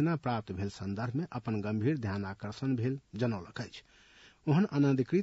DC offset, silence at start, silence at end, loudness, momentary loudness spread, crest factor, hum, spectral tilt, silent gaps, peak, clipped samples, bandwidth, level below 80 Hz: under 0.1%; 0 s; 0 s; -33 LUFS; 12 LU; 14 dB; none; -8 dB/octave; none; -18 dBFS; under 0.1%; 8 kHz; -68 dBFS